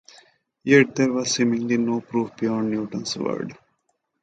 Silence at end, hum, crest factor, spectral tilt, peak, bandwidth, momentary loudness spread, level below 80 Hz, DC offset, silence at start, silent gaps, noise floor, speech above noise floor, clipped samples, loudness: 0.7 s; none; 20 dB; -4.5 dB/octave; -4 dBFS; 9.2 kHz; 11 LU; -66 dBFS; under 0.1%; 0.65 s; none; -73 dBFS; 51 dB; under 0.1%; -22 LUFS